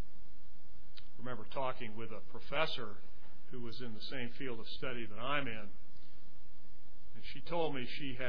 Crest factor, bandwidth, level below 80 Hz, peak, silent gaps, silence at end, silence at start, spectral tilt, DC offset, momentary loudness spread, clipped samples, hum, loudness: 26 dB; 5.4 kHz; -62 dBFS; -16 dBFS; none; 0 s; 0 s; -6.5 dB/octave; 4%; 21 LU; under 0.1%; none; -42 LUFS